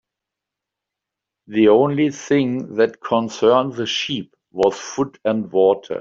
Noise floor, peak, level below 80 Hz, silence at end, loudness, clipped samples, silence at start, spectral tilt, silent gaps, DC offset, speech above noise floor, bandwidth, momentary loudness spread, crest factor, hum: -84 dBFS; -2 dBFS; -62 dBFS; 0 s; -19 LUFS; under 0.1%; 1.5 s; -5.5 dB/octave; none; under 0.1%; 66 dB; 7.6 kHz; 10 LU; 16 dB; none